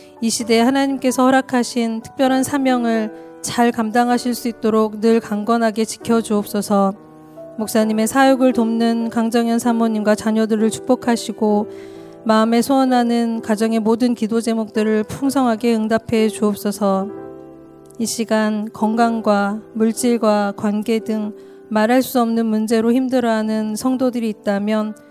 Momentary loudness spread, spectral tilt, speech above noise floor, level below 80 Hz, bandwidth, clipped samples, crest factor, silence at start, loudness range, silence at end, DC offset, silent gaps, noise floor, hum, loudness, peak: 7 LU; -5 dB/octave; 24 dB; -58 dBFS; 16 kHz; under 0.1%; 16 dB; 0.15 s; 2 LU; 0.2 s; under 0.1%; none; -41 dBFS; none; -18 LUFS; -2 dBFS